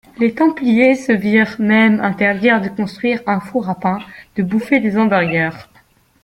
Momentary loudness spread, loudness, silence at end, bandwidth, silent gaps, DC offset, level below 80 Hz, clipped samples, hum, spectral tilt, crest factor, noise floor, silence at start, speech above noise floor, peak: 9 LU; -15 LUFS; 0.6 s; 11 kHz; none; under 0.1%; -54 dBFS; under 0.1%; none; -7 dB/octave; 14 dB; -52 dBFS; 0.2 s; 37 dB; -2 dBFS